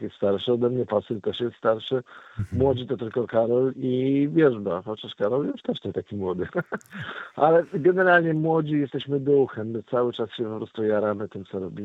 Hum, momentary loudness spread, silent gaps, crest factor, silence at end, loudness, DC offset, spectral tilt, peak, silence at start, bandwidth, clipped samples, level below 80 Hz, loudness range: none; 12 LU; none; 20 dB; 0 s; -24 LUFS; under 0.1%; -8.5 dB/octave; -4 dBFS; 0 s; 7.8 kHz; under 0.1%; -60 dBFS; 4 LU